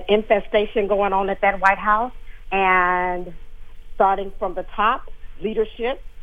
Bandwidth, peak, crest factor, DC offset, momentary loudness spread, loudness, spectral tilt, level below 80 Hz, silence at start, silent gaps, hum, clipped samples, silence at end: 7.8 kHz; -2 dBFS; 18 dB; under 0.1%; 11 LU; -21 LUFS; -6 dB/octave; -36 dBFS; 0 s; none; none; under 0.1%; 0 s